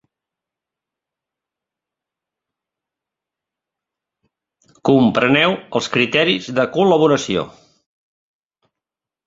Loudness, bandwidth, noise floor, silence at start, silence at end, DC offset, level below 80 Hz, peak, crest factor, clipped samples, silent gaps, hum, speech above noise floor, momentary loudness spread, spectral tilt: -16 LUFS; 7.8 kHz; -87 dBFS; 4.85 s; 1.75 s; under 0.1%; -58 dBFS; 0 dBFS; 20 dB; under 0.1%; none; none; 71 dB; 9 LU; -5 dB/octave